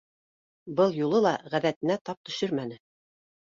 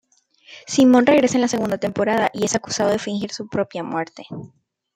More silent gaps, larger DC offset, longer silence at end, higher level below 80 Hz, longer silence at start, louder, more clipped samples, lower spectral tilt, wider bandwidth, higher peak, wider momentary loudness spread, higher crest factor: first, 1.76-1.81 s, 2.01-2.05 s, 2.17-2.24 s vs none; neither; first, 0.65 s vs 0.5 s; second, -72 dBFS vs -60 dBFS; first, 0.65 s vs 0.5 s; second, -27 LUFS vs -19 LUFS; neither; first, -6 dB/octave vs -4.5 dB/octave; second, 7.6 kHz vs 15 kHz; second, -10 dBFS vs -2 dBFS; second, 9 LU vs 17 LU; about the same, 18 dB vs 18 dB